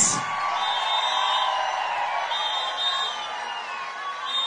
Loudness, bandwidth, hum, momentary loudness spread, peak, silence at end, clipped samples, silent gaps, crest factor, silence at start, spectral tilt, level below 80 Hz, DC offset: -25 LUFS; 10 kHz; none; 9 LU; -6 dBFS; 0 s; under 0.1%; none; 20 dB; 0 s; 0.5 dB/octave; -72 dBFS; under 0.1%